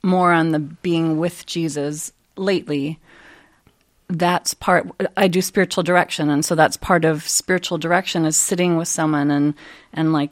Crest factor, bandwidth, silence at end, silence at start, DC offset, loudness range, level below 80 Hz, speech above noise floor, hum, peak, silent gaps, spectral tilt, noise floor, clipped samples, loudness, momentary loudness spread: 20 dB; 16 kHz; 0.05 s; 0.05 s; under 0.1%; 6 LU; -54 dBFS; 40 dB; none; 0 dBFS; none; -4.5 dB/octave; -58 dBFS; under 0.1%; -19 LUFS; 8 LU